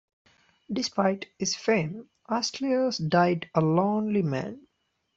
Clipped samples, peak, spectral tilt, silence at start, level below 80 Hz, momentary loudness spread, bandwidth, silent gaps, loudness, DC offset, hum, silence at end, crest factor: under 0.1%; -8 dBFS; -5 dB/octave; 0.7 s; -66 dBFS; 10 LU; 7.8 kHz; none; -27 LUFS; under 0.1%; none; 0.6 s; 20 dB